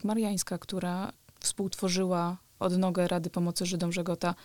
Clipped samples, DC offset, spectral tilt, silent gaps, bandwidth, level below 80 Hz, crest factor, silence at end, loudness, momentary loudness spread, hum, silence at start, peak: under 0.1%; 0.1%; -5 dB/octave; none; 19 kHz; -62 dBFS; 16 dB; 0 s; -31 LUFS; 6 LU; none; 0 s; -16 dBFS